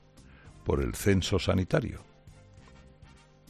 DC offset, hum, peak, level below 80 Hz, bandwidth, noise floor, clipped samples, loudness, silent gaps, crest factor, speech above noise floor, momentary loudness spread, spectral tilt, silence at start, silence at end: under 0.1%; none; -10 dBFS; -46 dBFS; 14 kHz; -55 dBFS; under 0.1%; -29 LUFS; none; 22 dB; 28 dB; 12 LU; -5.5 dB/octave; 0.2 s; 0.7 s